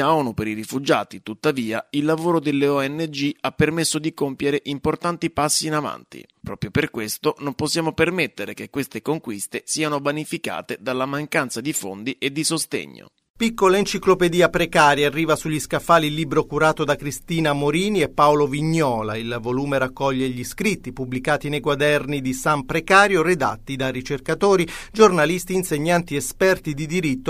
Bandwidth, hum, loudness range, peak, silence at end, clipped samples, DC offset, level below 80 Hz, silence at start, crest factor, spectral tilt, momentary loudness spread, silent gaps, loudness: 15.5 kHz; none; 6 LU; 0 dBFS; 0 s; under 0.1%; under 0.1%; -46 dBFS; 0 s; 20 dB; -4.5 dB/octave; 10 LU; 13.30-13.34 s; -21 LUFS